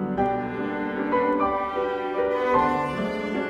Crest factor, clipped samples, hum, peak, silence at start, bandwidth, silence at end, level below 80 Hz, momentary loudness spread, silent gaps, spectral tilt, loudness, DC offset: 16 dB; under 0.1%; none; -10 dBFS; 0 s; 10 kHz; 0 s; -52 dBFS; 6 LU; none; -7 dB/octave; -25 LUFS; under 0.1%